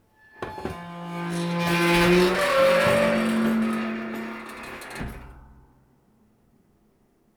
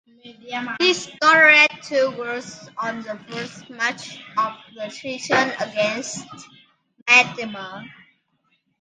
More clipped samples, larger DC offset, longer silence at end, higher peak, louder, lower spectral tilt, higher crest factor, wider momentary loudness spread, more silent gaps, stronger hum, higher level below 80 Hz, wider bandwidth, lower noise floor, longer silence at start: neither; neither; first, 1.95 s vs 0.9 s; second, -8 dBFS vs 0 dBFS; second, -22 LUFS vs -18 LUFS; first, -5.5 dB/octave vs -2.5 dB/octave; about the same, 18 dB vs 22 dB; about the same, 18 LU vs 20 LU; second, none vs 7.02-7.06 s; neither; first, -48 dBFS vs -70 dBFS; first, over 20 kHz vs 9.8 kHz; second, -63 dBFS vs -68 dBFS; first, 0.4 s vs 0.25 s